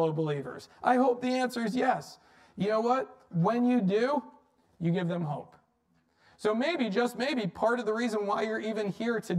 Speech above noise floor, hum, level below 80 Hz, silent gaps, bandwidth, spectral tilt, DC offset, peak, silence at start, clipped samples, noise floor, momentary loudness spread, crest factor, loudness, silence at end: 42 dB; none; -72 dBFS; none; 14 kHz; -6.5 dB/octave; under 0.1%; -12 dBFS; 0 s; under 0.1%; -71 dBFS; 9 LU; 18 dB; -30 LUFS; 0 s